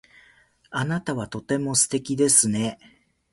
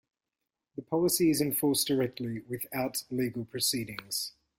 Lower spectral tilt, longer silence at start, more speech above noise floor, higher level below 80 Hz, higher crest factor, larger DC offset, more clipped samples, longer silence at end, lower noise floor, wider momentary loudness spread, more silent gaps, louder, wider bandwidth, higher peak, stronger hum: about the same, -3.5 dB/octave vs -4 dB/octave; about the same, 0.7 s vs 0.75 s; second, 35 dB vs 58 dB; first, -58 dBFS vs -66 dBFS; about the same, 20 dB vs 16 dB; neither; neither; first, 0.6 s vs 0.3 s; second, -58 dBFS vs -88 dBFS; about the same, 13 LU vs 11 LU; neither; first, -22 LUFS vs -30 LUFS; second, 12 kHz vs 16.5 kHz; first, -4 dBFS vs -14 dBFS; neither